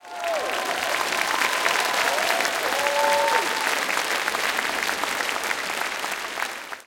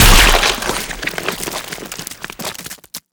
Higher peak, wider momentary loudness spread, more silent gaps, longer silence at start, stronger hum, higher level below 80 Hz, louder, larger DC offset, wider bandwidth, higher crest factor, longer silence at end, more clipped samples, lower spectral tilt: second, -4 dBFS vs 0 dBFS; second, 7 LU vs 19 LU; neither; about the same, 0.05 s vs 0 s; neither; second, -64 dBFS vs -20 dBFS; second, -23 LUFS vs -16 LUFS; neither; second, 17 kHz vs over 20 kHz; about the same, 20 dB vs 16 dB; about the same, 0.05 s vs 0.15 s; neither; second, 0 dB/octave vs -2 dB/octave